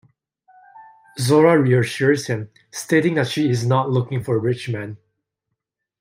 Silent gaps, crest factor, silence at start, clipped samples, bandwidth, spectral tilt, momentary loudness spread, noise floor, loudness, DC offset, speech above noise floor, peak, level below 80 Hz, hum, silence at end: none; 18 dB; 0.75 s; under 0.1%; 16 kHz; -6 dB/octave; 15 LU; -80 dBFS; -19 LUFS; under 0.1%; 61 dB; -2 dBFS; -62 dBFS; none; 1.05 s